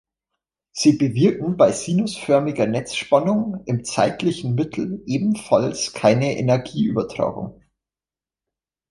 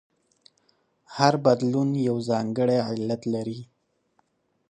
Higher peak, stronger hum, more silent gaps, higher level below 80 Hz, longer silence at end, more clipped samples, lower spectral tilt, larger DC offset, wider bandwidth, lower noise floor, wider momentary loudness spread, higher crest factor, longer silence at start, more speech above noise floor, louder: about the same, -2 dBFS vs -2 dBFS; neither; neither; first, -56 dBFS vs -68 dBFS; first, 1.4 s vs 1.05 s; neither; about the same, -6 dB/octave vs -6.5 dB/octave; neither; first, 11.5 kHz vs 10 kHz; first, under -90 dBFS vs -69 dBFS; second, 7 LU vs 11 LU; second, 18 dB vs 24 dB; second, 0.75 s vs 1.1 s; first, over 70 dB vs 46 dB; first, -20 LUFS vs -24 LUFS